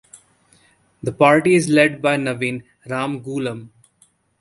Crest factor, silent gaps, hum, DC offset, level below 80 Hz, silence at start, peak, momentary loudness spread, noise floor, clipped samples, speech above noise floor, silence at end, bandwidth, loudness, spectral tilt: 20 dB; none; none; under 0.1%; -58 dBFS; 1.05 s; 0 dBFS; 15 LU; -59 dBFS; under 0.1%; 41 dB; 0.75 s; 11.5 kHz; -18 LUFS; -5.5 dB/octave